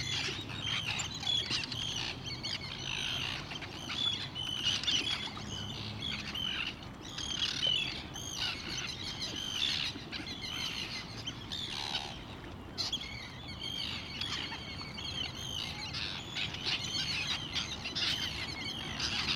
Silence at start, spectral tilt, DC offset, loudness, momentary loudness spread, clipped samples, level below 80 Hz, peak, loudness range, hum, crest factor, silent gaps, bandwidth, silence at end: 0 s; -2 dB/octave; under 0.1%; -35 LUFS; 9 LU; under 0.1%; -54 dBFS; -18 dBFS; 4 LU; none; 20 dB; none; 17 kHz; 0 s